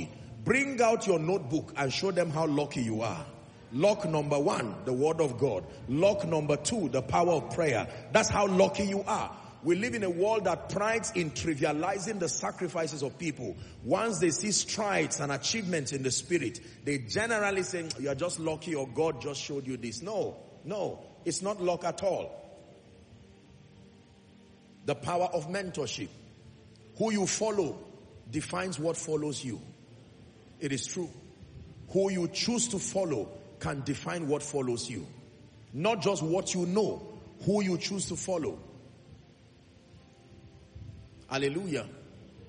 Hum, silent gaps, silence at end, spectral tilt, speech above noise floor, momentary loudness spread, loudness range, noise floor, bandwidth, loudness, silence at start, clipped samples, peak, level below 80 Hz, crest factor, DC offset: none; none; 0 s; -4.5 dB/octave; 27 dB; 13 LU; 8 LU; -57 dBFS; 10 kHz; -31 LUFS; 0 s; under 0.1%; -10 dBFS; -62 dBFS; 22 dB; under 0.1%